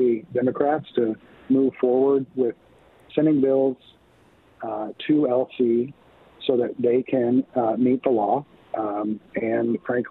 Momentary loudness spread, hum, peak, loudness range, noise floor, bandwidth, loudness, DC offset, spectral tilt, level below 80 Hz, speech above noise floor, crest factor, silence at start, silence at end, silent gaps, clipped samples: 10 LU; none; -6 dBFS; 2 LU; -56 dBFS; 4.2 kHz; -23 LUFS; under 0.1%; -10 dB/octave; -66 dBFS; 34 dB; 16 dB; 0 s; 0 s; none; under 0.1%